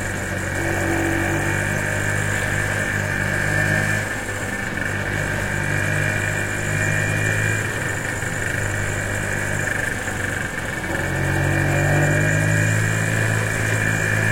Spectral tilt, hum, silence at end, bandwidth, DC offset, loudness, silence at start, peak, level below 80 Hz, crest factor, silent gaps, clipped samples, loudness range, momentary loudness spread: -4.5 dB/octave; none; 0 s; 16.5 kHz; under 0.1%; -21 LUFS; 0 s; -6 dBFS; -38 dBFS; 16 dB; none; under 0.1%; 3 LU; 6 LU